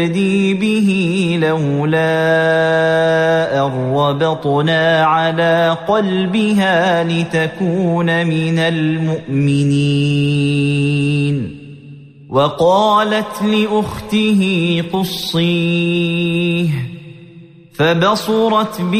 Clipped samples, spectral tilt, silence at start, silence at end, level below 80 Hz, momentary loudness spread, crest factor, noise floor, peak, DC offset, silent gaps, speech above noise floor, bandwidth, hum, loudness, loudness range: under 0.1%; -6.5 dB/octave; 0 s; 0 s; -50 dBFS; 5 LU; 12 dB; -40 dBFS; -2 dBFS; under 0.1%; none; 25 dB; 15 kHz; none; -15 LUFS; 2 LU